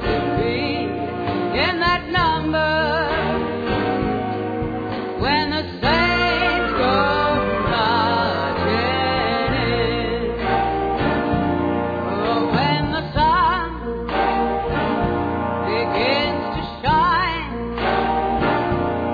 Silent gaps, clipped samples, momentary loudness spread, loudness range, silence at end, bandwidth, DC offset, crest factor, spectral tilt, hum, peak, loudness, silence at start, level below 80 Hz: none; under 0.1%; 6 LU; 2 LU; 0 s; 5 kHz; under 0.1%; 16 dB; -7.5 dB/octave; none; -4 dBFS; -20 LUFS; 0 s; -36 dBFS